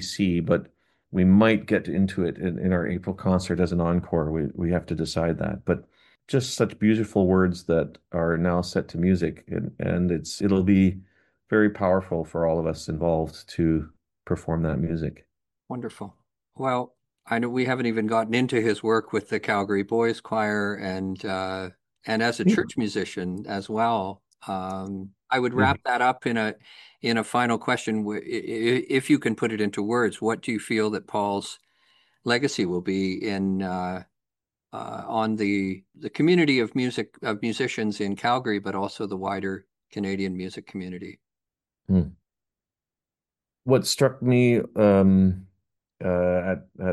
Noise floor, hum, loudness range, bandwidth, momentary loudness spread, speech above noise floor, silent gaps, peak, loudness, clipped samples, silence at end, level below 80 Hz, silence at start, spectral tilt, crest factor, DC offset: under -90 dBFS; none; 6 LU; 12.5 kHz; 13 LU; over 66 dB; none; -6 dBFS; -25 LUFS; under 0.1%; 0 s; -50 dBFS; 0 s; -6 dB/octave; 20 dB; under 0.1%